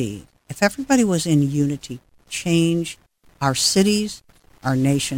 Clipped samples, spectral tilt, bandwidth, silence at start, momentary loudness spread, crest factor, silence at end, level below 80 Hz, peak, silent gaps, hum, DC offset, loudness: under 0.1%; -4.5 dB/octave; 18 kHz; 0 s; 20 LU; 18 dB; 0 s; -50 dBFS; -2 dBFS; none; none; under 0.1%; -20 LUFS